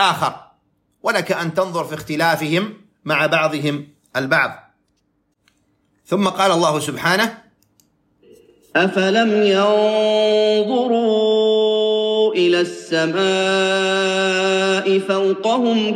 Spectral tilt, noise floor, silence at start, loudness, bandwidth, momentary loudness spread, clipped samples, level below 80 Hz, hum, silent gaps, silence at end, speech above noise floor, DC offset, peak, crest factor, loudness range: -4.5 dB/octave; -66 dBFS; 0 s; -17 LUFS; 16 kHz; 7 LU; under 0.1%; -66 dBFS; none; none; 0 s; 49 dB; under 0.1%; -4 dBFS; 16 dB; 5 LU